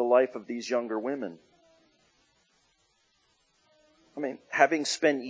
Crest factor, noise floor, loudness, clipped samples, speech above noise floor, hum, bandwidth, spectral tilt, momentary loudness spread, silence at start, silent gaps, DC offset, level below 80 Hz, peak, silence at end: 24 dB; -70 dBFS; -28 LUFS; under 0.1%; 43 dB; none; 8 kHz; -3 dB/octave; 13 LU; 0 s; none; under 0.1%; -84 dBFS; -6 dBFS; 0 s